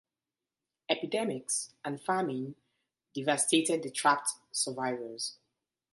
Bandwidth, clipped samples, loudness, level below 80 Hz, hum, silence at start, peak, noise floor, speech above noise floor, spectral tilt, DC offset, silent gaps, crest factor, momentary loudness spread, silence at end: 12 kHz; under 0.1%; -31 LUFS; -82 dBFS; none; 0.9 s; -10 dBFS; under -90 dBFS; over 58 dB; -2.5 dB/octave; under 0.1%; none; 24 dB; 12 LU; 0.6 s